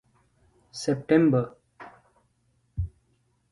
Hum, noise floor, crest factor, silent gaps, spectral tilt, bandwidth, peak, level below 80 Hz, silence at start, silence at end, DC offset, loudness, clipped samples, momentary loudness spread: none; -69 dBFS; 22 dB; none; -7 dB/octave; 11.5 kHz; -8 dBFS; -48 dBFS; 0.75 s; 0.65 s; under 0.1%; -26 LUFS; under 0.1%; 27 LU